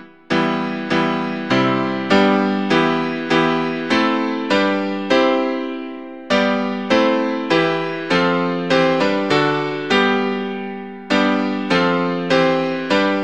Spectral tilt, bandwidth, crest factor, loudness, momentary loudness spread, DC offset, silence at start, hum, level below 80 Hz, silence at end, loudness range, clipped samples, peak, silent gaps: -5.5 dB/octave; 9.4 kHz; 18 dB; -18 LUFS; 7 LU; 0.4%; 0 s; none; -56 dBFS; 0 s; 1 LU; under 0.1%; 0 dBFS; none